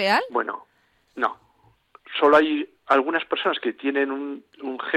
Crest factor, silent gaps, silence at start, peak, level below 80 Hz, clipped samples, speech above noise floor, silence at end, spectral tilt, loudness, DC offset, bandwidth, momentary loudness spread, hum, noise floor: 18 dB; none; 0 s; -6 dBFS; -68 dBFS; under 0.1%; 38 dB; 0 s; -4.5 dB/octave; -23 LUFS; under 0.1%; 13.5 kHz; 17 LU; none; -61 dBFS